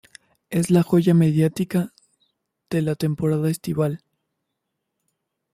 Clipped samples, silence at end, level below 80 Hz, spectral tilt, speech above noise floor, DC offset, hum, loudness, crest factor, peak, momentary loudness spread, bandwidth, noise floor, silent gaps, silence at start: under 0.1%; 1.55 s; -58 dBFS; -7.5 dB/octave; 59 dB; under 0.1%; none; -21 LUFS; 18 dB; -6 dBFS; 10 LU; 15 kHz; -79 dBFS; none; 0.5 s